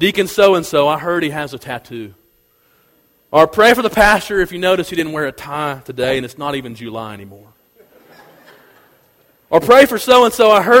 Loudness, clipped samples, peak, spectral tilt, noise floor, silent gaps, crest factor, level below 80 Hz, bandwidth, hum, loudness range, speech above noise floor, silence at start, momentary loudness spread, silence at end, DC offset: -13 LUFS; 0.1%; 0 dBFS; -4 dB/octave; -57 dBFS; none; 16 dB; -42 dBFS; 17.5 kHz; none; 11 LU; 43 dB; 0 s; 18 LU; 0 s; under 0.1%